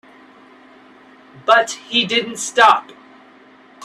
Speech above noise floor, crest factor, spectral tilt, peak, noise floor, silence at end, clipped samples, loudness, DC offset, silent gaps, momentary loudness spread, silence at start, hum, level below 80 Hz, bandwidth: 31 dB; 20 dB; -1.5 dB/octave; 0 dBFS; -47 dBFS; 0 s; under 0.1%; -15 LUFS; under 0.1%; none; 8 LU; 1.45 s; none; -68 dBFS; 13.5 kHz